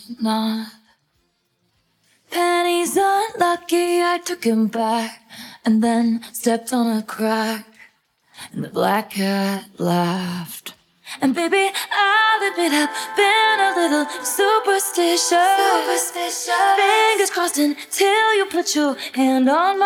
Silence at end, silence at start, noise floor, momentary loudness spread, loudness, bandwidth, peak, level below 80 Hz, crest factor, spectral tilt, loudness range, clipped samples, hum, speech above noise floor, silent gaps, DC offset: 0 s; 0 s; -67 dBFS; 11 LU; -18 LUFS; 18.5 kHz; -4 dBFS; -72 dBFS; 16 dB; -3 dB/octave; 6 LU; under 0.1%; none; 49 dB; none; under 0.1%